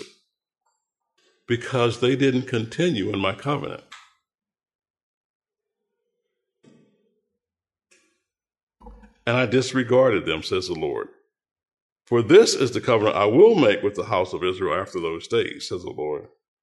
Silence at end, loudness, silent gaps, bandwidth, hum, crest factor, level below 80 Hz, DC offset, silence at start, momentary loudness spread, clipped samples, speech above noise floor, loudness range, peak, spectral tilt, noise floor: 0.35 s; -21 LUFS; 4.75-4.79 s, 4.90-4.94 s, 5.03-5.40 s, 8.63-8.67 s, 11.73-11.96 s; 11.5 kHz; none; 20 dB; -60 dBFS; under 0.1%; 0 s; 15 LU; under 0.1%; over 69 dB; 10 LU; -2 dBFS; -5.5 dB/octave; under -90 dBFS